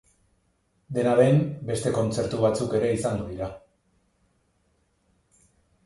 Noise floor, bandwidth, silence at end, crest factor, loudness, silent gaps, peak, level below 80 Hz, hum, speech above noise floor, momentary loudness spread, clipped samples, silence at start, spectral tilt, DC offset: -69 dBFS; 11.5 kHz; 2.25 s; 20 dB; -25 LUFS; none; -6 dBFS; -54 dBFS; none; 46 dB; 13 LU; under 0.1%; 0.9 s; -6.5 dB/octave; under 0.1%